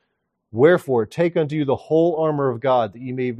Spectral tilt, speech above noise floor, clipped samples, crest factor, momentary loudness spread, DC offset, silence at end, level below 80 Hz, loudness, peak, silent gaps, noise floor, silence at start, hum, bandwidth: -8 dB/octave; 55 dB; under 0.1%; 18 dB; 8 LU; under 0.1%; 0 s; -64 dBFS; -20 LUFS; -2 dBFS; none; -74 dBFS; 0.55 s; none; 13 kHz